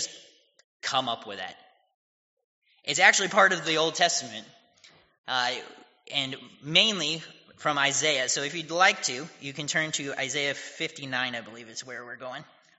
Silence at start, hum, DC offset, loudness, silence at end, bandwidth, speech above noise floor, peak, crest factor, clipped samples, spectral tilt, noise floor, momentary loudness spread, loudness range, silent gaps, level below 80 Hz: 0 s; none; under 0.1%; -25 LUFS; 0.35 s; 8 kHz; 31 dB; -4 dBFS; 26 dB; under 0.1%; 0 dB/octave; -58 dBFS; 19 LU; 5 LU; 0.64-0.80 s, 1.94-2.37 s, 2.44-2.62 s, 5.18-5.24 s; -78 dBFS